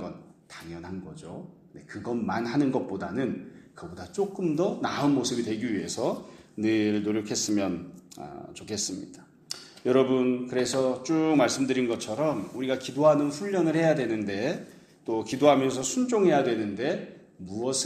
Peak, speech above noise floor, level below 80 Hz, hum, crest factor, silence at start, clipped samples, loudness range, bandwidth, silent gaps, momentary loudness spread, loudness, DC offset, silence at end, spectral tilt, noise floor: -6 dBFS; 21 dB; -66 dBFS; none; 22 dB; 0 s; under 0.1%; 6 LU; 14.5 kHz; none; 19 LU; -27 LUFS; under 0.1%; 0 s; -5 dB/octave; -48 dBFS